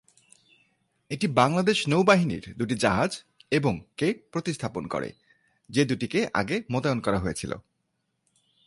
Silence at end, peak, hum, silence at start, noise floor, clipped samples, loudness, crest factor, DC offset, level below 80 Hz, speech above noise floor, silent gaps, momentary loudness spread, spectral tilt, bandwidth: 1.05 s; -6 dBFS; none; 1.1 s; -77 dBFS; under 0.1%; -26 LUFS; 22 dB; under 0.1%; -54 dBFS; 51 dB; none; 11 LU; -5.5 dB/octave; 11.5 kHz